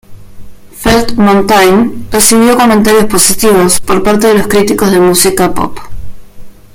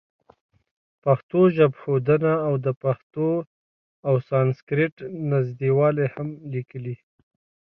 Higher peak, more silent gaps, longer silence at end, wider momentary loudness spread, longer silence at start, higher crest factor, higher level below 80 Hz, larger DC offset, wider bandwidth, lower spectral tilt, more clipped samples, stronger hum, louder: first, 0 dBFS vs -6 dBFS; second, none vs 1.23-1.29 s, 2.77-2.81 s, 3.03-3.10 s, 3.47-4.03 s, 4.62-4.67 s, 4.92-4.97 s; second, 0.25 s vs 0.8 s; second, 6 LU vs 13 LU; second, 0.1 s vs 1.05 s; second, 8 dB vs 18 dB; first, -30 dBFS vs -64 dBFS; neither; first, over 20 kHz vs 5.2 kHz; second, -3.5 dB/octave vs -11 dB/octave; first, 0.9% vs under 0.1%; neither; first, -7 LUFS vs -23 LUFS